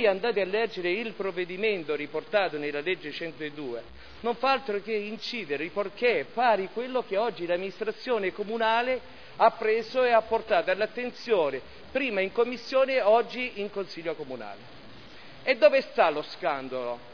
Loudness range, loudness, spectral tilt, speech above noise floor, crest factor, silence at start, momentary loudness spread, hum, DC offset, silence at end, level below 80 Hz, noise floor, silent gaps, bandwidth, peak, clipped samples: 4 LU; -28 LUFS; -5.5 dB/octave; 21 dB; 22 dB; 0 s; 12 LU; none; 0.4%; 0 s; -64 dBFS; -48 dBFS; none; 5.4 kHz; -6 dBFS; under 0.1%